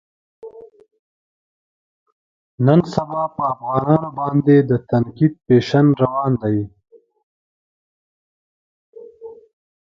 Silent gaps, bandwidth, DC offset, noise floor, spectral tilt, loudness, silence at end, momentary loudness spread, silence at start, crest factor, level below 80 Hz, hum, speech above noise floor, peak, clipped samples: 0.99-2.06 s, 2.12-2.58 s, 7.23-8.93 s; 7.4 kHz; under 0.1%; -39 dBFS; -9 dB/octave; -17 LUFS; 0.65 s; 13 LU; 0.45 s; 20 dB; -54 dBFS; none; 23 dB; 0 dBFS; under 0.1%